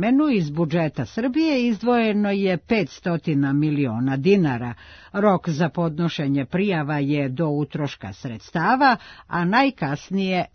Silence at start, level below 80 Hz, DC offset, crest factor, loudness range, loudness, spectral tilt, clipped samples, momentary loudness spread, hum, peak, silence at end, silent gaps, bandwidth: 0 s; -56 dBFS; under 0.1%; 16 dB; 2 LU; -22 LUFS; -7.5 dB/octave; under 0.1%; 10 LU; none; -6 dBFS; 0.1 s; none; 6.6 kHz